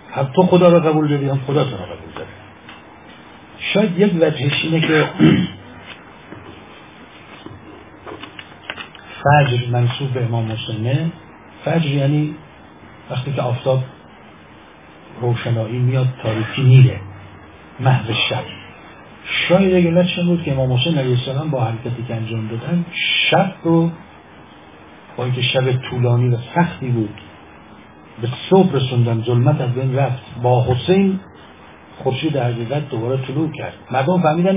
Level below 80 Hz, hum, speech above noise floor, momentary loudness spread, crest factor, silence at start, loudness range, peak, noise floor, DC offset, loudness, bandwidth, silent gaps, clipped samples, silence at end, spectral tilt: -48 dBFS; none; 26 dB; 22 LU; 18 dB; 0.05 s; 5 LU; 0 dBFS; -42 dBFS; 0.1%; -17 LUFS; 3.8 kHz; none; under 0.1%; 0 s; -11 dB/octave